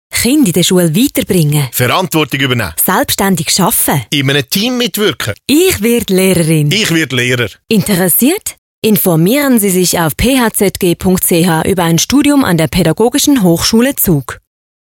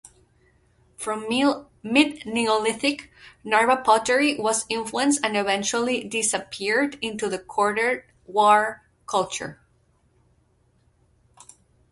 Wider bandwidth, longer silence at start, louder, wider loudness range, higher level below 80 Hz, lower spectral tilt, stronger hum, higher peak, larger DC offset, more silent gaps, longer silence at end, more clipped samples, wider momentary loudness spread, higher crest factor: first, 17 kHz vs 11.5 kHz; second, 0.1 s vs 1 s; first, -10 LUFS vs -23 LUFS; second, 1 LU vs 4 LU; first, -36 dBFS vs -62 dBFS; first, -4 dB/octave vs -2.5 dB/octave; neither; first, 0 dBFS vs -4 dBFS; neither; first, 8.58-8.82 s vs none; second, 0.5 s vs 2.35 s; neither; second, 4 LU vs 11 LU; second, 10 dB vs 20 dB